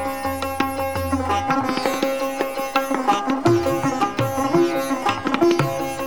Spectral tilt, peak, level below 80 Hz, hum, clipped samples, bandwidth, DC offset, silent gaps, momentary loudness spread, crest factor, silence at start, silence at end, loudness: -5.5 dB/octave; -2 dBFS; -46 dBFS; none; under 0.1%; 19.5 kHz; 0.7%; none; 5 LU; 20 dB; 0 s; 0 s; -21 LUFS